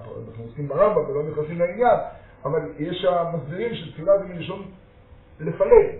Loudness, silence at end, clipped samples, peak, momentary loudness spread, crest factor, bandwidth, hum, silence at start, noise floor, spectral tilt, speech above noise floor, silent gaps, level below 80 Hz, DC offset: -23 LUFS; 0 s; under 0.1%; 0 dBFS; 16 LU; 22 dB; 4.1 kHz; none; 0 s; -49 dBFS; -5.5 dB/octave; 27 dB; none; -46 dBFS; under 0.1%